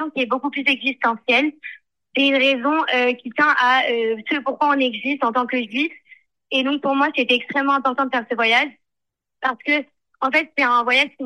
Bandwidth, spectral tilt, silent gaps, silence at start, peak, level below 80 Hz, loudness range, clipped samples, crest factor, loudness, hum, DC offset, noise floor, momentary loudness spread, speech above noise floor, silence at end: 11.5 kHz; -3.5 dB/octave; none; 0 s; -4 dBFS; -74 dBFS; 2 LU; under 0.1%; 16 dB; -19 LUFS; none; under 0.1%; -83 dBFS; 8 LU; 63 dB; 0 s